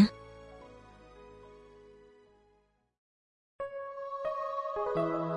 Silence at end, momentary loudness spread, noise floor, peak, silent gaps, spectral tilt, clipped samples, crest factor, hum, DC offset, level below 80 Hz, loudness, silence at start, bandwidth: 0 s; 23 LU; -71 dBFS; -12 dBFS; 2.98-3.59 s; -7.5 dB/octave; under 0.1%; 24 dB; none; under 0.1%; -64 dBFS; -35 LUFS; 0 s; 10.5 kHz